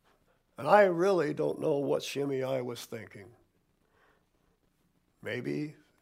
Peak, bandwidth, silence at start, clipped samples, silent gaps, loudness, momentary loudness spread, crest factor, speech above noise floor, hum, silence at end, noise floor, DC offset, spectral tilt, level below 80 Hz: -8 dBFS; 16 kHz; 0.6 s; under 0.1%; none; -30 LUFS; 19 LU; 24 dB; 43 dB; none; 0.3 s; -72 dBFS; under 0.1%; -5.5 dB/octave; -76 dBFS